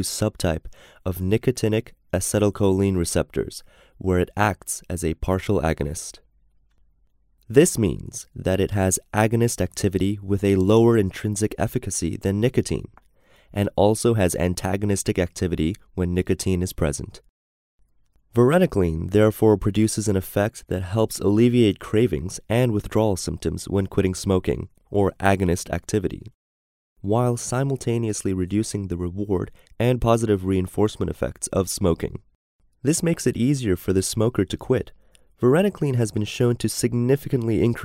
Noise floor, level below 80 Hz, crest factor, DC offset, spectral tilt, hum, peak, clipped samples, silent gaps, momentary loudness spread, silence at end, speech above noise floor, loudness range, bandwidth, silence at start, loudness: -61 dBFS; -44 dBFS; 22 dB; under 0.1%; -6 dB/octave; none; 0 dBFS; under 0.1%; 17.29-17.79 s, 26.34-26.96 s, 32.35-32.59 s; 9 LU; 0 s; 40 dB; 4 LU; 16 kHz; 0 s; -22 LUFS